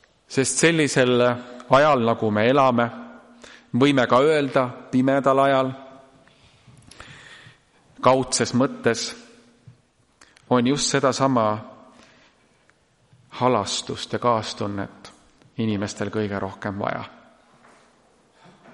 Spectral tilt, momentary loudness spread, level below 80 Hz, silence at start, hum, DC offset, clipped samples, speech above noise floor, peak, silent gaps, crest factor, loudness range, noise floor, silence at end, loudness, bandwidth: -4.5 dB/octave; 15 LU; -60 dBFS; 0.3 s; none; under 0.1%; under 0.1%; 40 dB; -2 dBFS; none; 22 dB; 7 LU; -61 dBFS; 1.65 s; -21 LUFS; 11.5 kHz